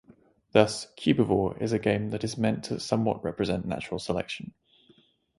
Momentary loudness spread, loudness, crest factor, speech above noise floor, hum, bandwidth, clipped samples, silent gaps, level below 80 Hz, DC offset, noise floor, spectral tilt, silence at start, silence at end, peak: 9 LU; -28 LUFS; 24 dB; 35 dB; none; 11.5 kHz; under 0.1%; none; -54 dBFS; under 0.1%; -62 dBFS; -6 dB/octave; 0.55 s; 0.95 s; -4 dBFS